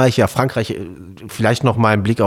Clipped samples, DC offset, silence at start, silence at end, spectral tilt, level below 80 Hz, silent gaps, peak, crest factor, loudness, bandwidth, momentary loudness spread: under 0.1%; under 0.1%; 0 s; 0 s; -6 dB/octave; -46 dBFS; none; -2 dBFS; 14 dB; -17 LUFS; 16 kHz; 18 LU